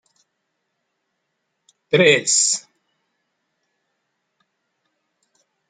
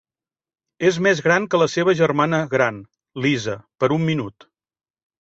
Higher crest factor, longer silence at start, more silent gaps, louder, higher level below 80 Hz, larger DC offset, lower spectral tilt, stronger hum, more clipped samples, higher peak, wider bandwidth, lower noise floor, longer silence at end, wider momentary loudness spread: first, 24 dB vs 18 dB; first, 1.9 s vs 0.8 s; neither; first, -16 LUFS vs -20 LUFS; second, -74 dBFS vs -60 dBFS; neither; second, -2 dB/octave vs -5.5 dB/octave; neither; neither; about the same, -2 dBFS vs -2 dBFS; first, 9.6 kHz vs 8 kHz; second, -75 dBFS vs under -90 dBFS; first, 3.1 s vs 0.9 s; about the same, 8 LU vs 10 LU